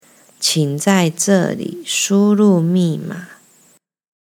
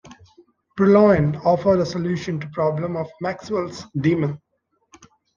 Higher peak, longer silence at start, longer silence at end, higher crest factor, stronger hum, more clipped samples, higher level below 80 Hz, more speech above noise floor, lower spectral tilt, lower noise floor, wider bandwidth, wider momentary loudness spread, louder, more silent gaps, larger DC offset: first, 0 dBFS vs -4 dBFS; first, 0.4 s vs 0.05 s; about the same, 1.05 s vs 1 s; about the same, 16 dB vs 18 dB; neither; neither; second, -72 dBFS vs -52 dBFS; about the same, 40 dB vs 37 dB; second, -4.5 dB/octave vs -8 dB/octave; about the same, -55 dBFS vs -56 dBFS; first, 17 kHz vs 7.4 kHz; about the same, 13 LU vs 13 LU; first, -16 LUFS vs -20 LUFS; neither; neither